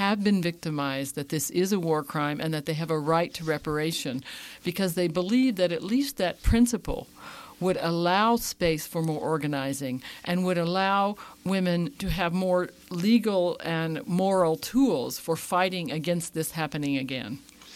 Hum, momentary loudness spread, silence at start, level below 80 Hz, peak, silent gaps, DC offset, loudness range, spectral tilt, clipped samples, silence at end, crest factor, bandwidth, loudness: none; 9 LU; 0 s; -44 dBFS; -10 dBFS; none; under 0.1%; 2 LU; -5 dB/octave; under 0.1%; 0 s; 18 dB; 16.5 kHz; -27 LUFS